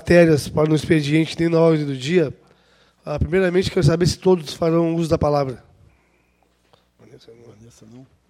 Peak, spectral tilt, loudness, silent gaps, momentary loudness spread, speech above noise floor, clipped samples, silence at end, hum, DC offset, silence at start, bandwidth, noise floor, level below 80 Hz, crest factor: 0 dBFS; -6.5 dB/octave; -19 LUFS; none; 9 LU; 44 dB; under 0.1%; 0.25 s; none; under 0.1%; 0.05 s; 14.5 kHz; -62 dBFS; -42 dBFS; 20 dB